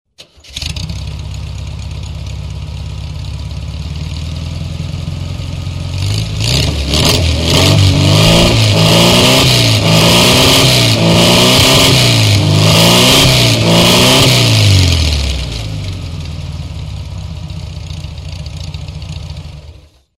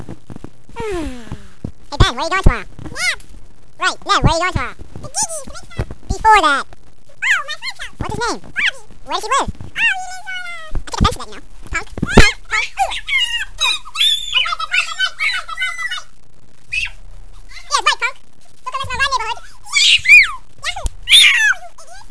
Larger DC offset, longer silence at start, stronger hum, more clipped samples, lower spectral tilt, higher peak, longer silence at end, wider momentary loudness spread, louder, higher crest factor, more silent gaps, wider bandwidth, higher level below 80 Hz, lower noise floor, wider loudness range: second, under 0.1% vs 4%; first, 0.5 s vs 0 s; neither; about the same, 0.1% vs 0.2%; first, -4 dB/octave vs -2.5 dB/octave; about the same, 0 dBFS vs 0 dBFS; first, 0.45 s vs 0.1 s; about the same, 19 LU vs 19 LU; first, -8 LUFS vs -15 LUFS; second, 12 dB vs 18 dB; neither; first, 16.5 kHz vs 11 kHz; about the same, -24 dBFS vs -28 dBFS; about the same, -38 dBFS vs -37 dBFS; first, 17 LU vs 8 LU